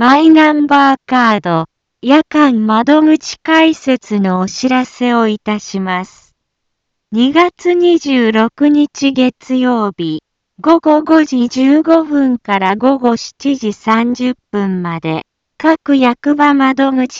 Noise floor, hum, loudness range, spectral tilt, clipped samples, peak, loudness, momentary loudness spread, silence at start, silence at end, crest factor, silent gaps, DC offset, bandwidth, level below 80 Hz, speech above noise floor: -71 dBFS; none; 4 LU; -5.5 dB/octave; under 0.1%; 0 dBFS; -12 LUFS; 9 LU; 0 s; 0 s; 12 dB; none; under 0.1%; 7.6 kHz; -56 dBFS; 60 dB